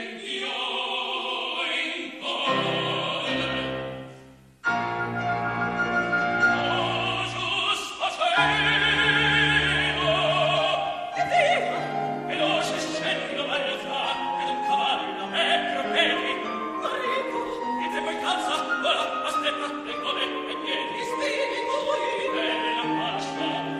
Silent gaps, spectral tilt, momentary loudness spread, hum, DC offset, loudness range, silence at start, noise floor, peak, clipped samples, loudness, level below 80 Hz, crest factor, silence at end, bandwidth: none; -3.5 dB/octave; 9 LU; none; under 0.1%; 6 LU; 0 s; -49 dBFS; -8 dBFS; under 0.1%; -25 LUFS; -54 dBFS; 18 dB; 0 s; 14 kHz